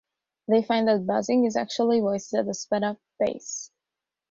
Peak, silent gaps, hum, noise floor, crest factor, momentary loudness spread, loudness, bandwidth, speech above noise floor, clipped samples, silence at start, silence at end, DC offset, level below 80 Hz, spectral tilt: -10 dBFS; none; none; -88 dBFS; 16 dB; 11 LU; -25 LUFS; 7.8 kHz; 63 dB; under 0.1%; 0.5 s; 0.65 s; under 0.1%; -68 dBFS; -4.5 dB/octave